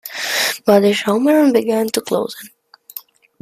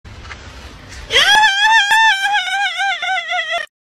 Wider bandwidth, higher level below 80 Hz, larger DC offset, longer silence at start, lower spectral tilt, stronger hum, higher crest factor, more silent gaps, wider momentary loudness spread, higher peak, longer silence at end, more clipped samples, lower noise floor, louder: about the same, 15.5 kHz vs 15.5 kHz; second, -62 dBFS vs -42 dBFS; neither; about the same, 0.05 s vs 0.05 s; first, -4 dB/octave vs 0.5 dB/octave; neither; about the same, 16 dB vs 16 dB; neither; second, 21 LU vs 24 LU; about the same, 0 dBFS vs 0 dBFS; first, 0.4 s vs 0.25 s; neither; about the same, -38 dBFS vs -35 dBFS; about the same, -15 LUFS vs -13 LUFS